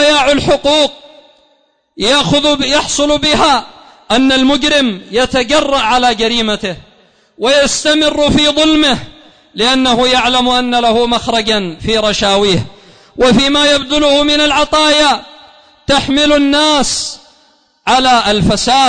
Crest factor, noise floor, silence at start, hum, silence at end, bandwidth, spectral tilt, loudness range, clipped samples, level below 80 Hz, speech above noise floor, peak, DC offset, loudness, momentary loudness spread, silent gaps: 10 dB; -56 dBFS; 0 s; none; 0 s; 9.6 kHz; -3 dB/octave; 2 LU; under 0.1%; -34 dBFS; 45 dB; -2 dBFS; under 0.1%; -10 LUFS; 7 LU; none